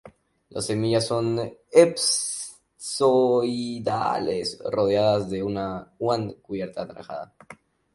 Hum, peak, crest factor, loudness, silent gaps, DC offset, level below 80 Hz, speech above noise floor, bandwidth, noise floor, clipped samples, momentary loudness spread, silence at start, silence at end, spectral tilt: none; -4 dBFS; 22 dB; -24 LUFS; none; under 0.1%; -58 dBFS; 27 dB; 11.5 kHz; -51 dBFS; under 0.1%; 16 LU; 0.05 s; 0.4 s; -4.5 dB/octave